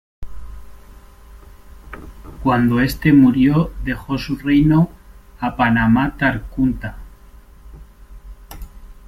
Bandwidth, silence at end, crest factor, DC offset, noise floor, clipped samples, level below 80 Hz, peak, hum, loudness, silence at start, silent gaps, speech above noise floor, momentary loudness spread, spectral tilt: 15.5 kHz; 0.15 s; 16 dB; under 0.1%; -43 dBFS; under 0.1%; -34 dBFS; -2 dBFS; none; -17 LUFS; 0.2 s; none; 27 dB; 25 LU; -7.5 dB/octave